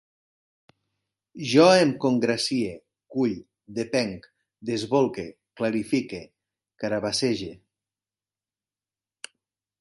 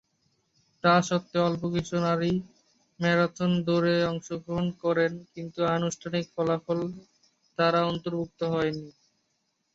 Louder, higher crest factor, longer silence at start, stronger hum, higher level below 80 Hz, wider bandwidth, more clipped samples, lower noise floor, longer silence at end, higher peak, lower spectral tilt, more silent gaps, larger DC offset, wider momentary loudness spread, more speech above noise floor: first, -24 LUFS vs -27 LUFS; about the same, 22 dB vs 22 dB; first, 1.35 s vs 0.85 s; neither; about the same, -64 dBFS vs -60 dBFS; first, 11.5 kHz vs 7.8 kHz; neither; first, under -90 dBFS vs -76 dBFS; first, 2.25 s vs 0.85 s; about the same, -4 dBFS vs -6 dBFS; about the same, -5 dB/octave vs -6 dB/octave; neither; neither; first, 21 LU vs 9 LU; first, over 66 dB vs 49 dB